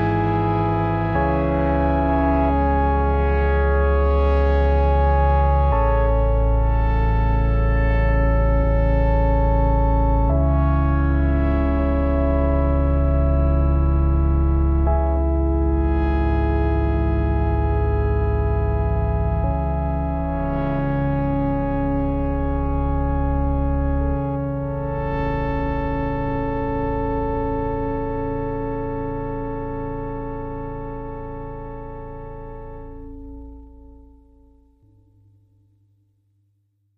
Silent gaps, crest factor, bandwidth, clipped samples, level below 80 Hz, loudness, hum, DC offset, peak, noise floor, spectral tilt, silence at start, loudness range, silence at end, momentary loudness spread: none; 12 dB; 4.4 kHz; under 0.1%; -22 dBFS; -21 LUFS; none; under 0.1%; -8 dBFS; -66 dBFS; -11 dB/octave; 0 s; 11 LU; 3.15 s; 11 LU